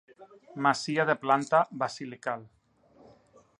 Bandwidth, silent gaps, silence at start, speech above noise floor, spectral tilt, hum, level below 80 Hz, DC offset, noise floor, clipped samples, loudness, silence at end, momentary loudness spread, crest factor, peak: 11 kHz; none; 0.2 s; 32 dB; -4.5 dB/octave; none; -76 dBFS; under 0.1%; -60 dBFS; under 0.1%; -28 LUFS; 1.15 s; 12 LU; 22 dB; -10 dBFS